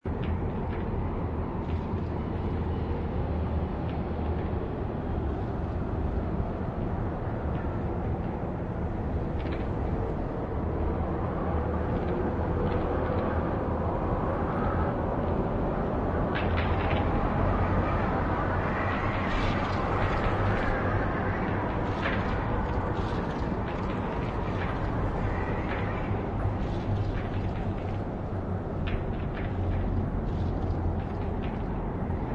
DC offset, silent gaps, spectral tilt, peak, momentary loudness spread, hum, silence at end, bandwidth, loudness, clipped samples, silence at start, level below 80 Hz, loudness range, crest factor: under 0.1%; none; -9 dB/octave; -14 dBFS; 5 LU; none; 0 s; 7 kHz; -30 LUFS; under 0.1%; 0.05 s; -36 dBFS; 4 LU; 14 dB